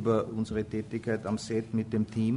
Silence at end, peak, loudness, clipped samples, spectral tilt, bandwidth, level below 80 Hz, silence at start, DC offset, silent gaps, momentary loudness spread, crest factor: 0 s; -14 dBFS; -32 LUFS; under 0.1%; -7 dB/octave; 10.5 kHz; -56 dBFS; 0 s; under 0.1%; none; 4 LU; 16 dB